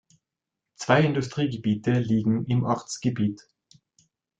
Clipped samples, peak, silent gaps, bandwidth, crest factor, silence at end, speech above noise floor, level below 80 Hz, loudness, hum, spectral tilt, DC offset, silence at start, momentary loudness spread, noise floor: under 0.1%; -6 dBFS; none; 9.2 kHz; 20 dB; 1.05 s; 62 dB; -60 dBFS; -25 LUFS; none; -6.5 dB/octave; under 0.1%; 0.8 s; 8 LU; -86 dBFS